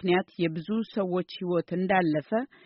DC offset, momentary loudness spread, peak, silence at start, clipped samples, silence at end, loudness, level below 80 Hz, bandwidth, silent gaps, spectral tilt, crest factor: under 0.1%; 6 LU; -12 dBFS; 0 s; under 0.1%; 0.2 s; -28 LUFS; -66 dBFS; 5.8 kHz; none; -5 dB/octave; 16 dB